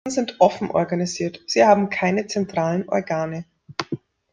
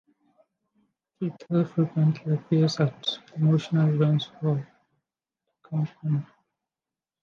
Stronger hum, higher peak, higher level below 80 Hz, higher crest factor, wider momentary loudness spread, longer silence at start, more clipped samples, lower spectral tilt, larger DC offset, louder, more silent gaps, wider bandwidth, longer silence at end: neither; first, -2 dBFS vs -10 dBFS; first, -62 dBFS vs -72 dBFS; about the same, 20 dB vs 16 dB; first, 15 LU vs 9 LU; second, 0.05 s vs 1.2 s; neither; second, -5 dB/octave vs -7.5 dB/octave; neither; first, -21 LUFS vs -26 LUFS; neither; first, 9.8 kHz vs 7 kHz; second, 0.35 s vs 0.95 s